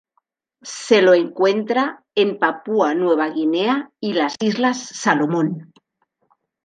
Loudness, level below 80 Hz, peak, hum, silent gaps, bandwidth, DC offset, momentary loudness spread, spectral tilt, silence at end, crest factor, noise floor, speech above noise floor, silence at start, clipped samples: -19 LUFS; -70 dBFS; -2 dBFS; none; none; 9.6 kHz; under 0.1%; 8 LU; -4.5 dB/octave; 1 s; 18 dB; -69 dBFS; 51 dB; 0.65 s; under 0.1%